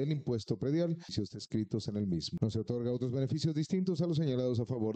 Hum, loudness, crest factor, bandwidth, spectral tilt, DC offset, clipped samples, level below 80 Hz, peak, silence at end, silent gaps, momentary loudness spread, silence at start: none; -34 LUFS; 16 dB; 8.8 kHz; -7.5 dB/octave; under 0.1%; under 0.1%; -64 dBFS; -18 dBFS; 0 s; none; 5 LU; 0 s